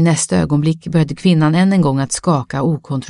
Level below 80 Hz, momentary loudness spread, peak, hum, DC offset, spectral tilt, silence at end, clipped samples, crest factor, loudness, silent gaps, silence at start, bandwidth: -44 dBFS; 5 LU; 0 dBFS; none; under 0.1%; -6 dB/octave; 0 s; under 0.1%; 14 dB; -15 LUFS; none; 0 s; 11.5 kHz